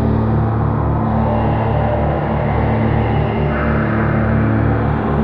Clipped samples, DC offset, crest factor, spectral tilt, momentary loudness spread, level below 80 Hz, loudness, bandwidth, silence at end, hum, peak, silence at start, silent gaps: under 0.1%; under 0.1%; 12 dB; -11 dB/octave; 2 LU; -24 dBFS; -16 LUFS; 4.6 kHz; 0 s; none; -4 dBFS; 0 s; none